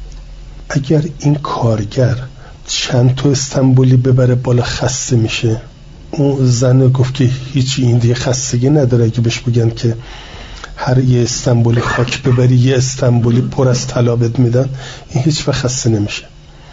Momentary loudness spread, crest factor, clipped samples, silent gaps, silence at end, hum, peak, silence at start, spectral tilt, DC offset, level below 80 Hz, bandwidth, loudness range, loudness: 10 LU; 10 dB; under 0.1%; none; 0 s; none; -2 dBFS; 0 s; -6 dB/octave; under 0.1%; -34 dBFS; 7.8 kHz; 2 LU; -13 LUFS